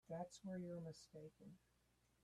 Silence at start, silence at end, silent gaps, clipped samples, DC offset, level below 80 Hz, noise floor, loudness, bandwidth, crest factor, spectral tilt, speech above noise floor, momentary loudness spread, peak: 0.05 s; 0.65 s; none; under 0.1%; under 0.1%; -82 dBFS; -80 dBFS; -54 LUFS; 13.5 kHz; 18 dB; -6.5 dB/octave; 26 dB; 13 LU; -36 dBFS